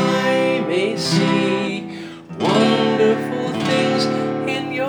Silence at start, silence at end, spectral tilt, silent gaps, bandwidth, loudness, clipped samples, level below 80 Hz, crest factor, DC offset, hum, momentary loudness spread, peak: 0 s; 0 s; -5.5 dB/octave; none; over 20 kHz; -18 LUFS; under 0.1%; -62 dBFS; 14 dB; under 0.1%; none; 8 LU; -4 dBFS